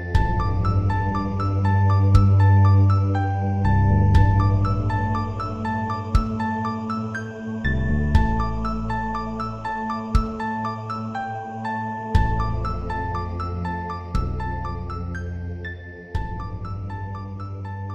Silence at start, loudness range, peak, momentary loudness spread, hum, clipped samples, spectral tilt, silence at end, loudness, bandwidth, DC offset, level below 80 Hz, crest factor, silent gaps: 0 s; 11 LU; -2 dBFS; 14 LU; none; under 0.1%; -8.5 dB/octave; 0 s; -23 LUFS; 6.8 kHz; under 0.1%; -30 dBFS; 20 dB; none